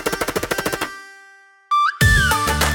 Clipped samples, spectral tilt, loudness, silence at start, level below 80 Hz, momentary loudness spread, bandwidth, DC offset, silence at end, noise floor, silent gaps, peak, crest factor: under 0.1%; -3.5 dB/octave; -18 LUFS; 0 s; -30 dBFS; 12 LU; 18 kHz; under 0.1%; 0 s; -48 dBFS; none; -2 dBFS; 18 dB